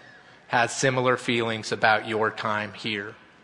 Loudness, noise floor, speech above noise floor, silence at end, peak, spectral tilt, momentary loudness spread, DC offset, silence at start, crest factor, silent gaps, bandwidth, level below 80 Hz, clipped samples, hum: -25 LUFS; -50 dBFS; 25 dB; 0.25 s; -4 dBFS; -4 dB/octave; 8 LU; under 0.1%; 0.15 s; 22 dB; none; 11 kHz; -68 dBFS; under 0.1%; none